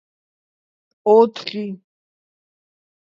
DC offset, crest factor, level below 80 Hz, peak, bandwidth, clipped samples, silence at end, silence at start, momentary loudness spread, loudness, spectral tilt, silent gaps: under 0.1%; 20 dB; -74 dBFS; -2 dBFS; 7.2 kHz; under 0.1%; 1.35 s; 1.05 s; 17 LU; -17 LUFS; -6.5 dB/octave; none